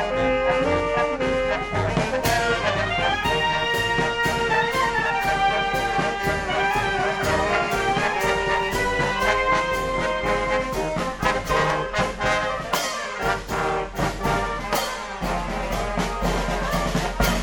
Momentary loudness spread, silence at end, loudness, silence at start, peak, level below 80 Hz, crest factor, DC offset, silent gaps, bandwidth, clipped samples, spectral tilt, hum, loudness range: 4 LU; 0 s; -22 LUFS; 0 s; -4 dBFS; -36 dBFS; 18 dB; under 0.1%; none; 17.5 kHz; under 0.1%; -4 dB/octave; none; 4 LU